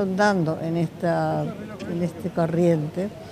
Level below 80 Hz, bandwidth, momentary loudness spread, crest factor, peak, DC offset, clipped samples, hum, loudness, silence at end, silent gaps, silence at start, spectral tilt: -58 dBFS; 14.5 kHz; 10 LU; 14 dB; -8 dBFS; under 0.1%; under 0.1%; none; -24 LUFS; 0 s; none; 0 s; -7.5 dB/octave